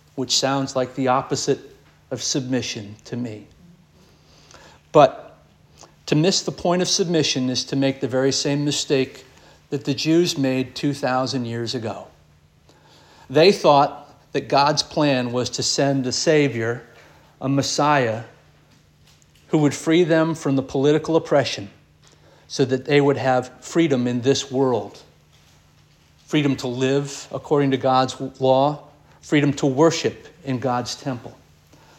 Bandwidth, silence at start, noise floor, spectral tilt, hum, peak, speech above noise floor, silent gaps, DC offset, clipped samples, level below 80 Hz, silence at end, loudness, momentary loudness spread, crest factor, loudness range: 16 kHz; 0.15 s; -55 dBFS; -4.5 dB/octave; none; -2 dBFS; 35 dB; none; under 0.1%; under 0.1%; -60 dBFS; 0.65 s; -20 LUFS; 13 LU; 20 dB; 5 LU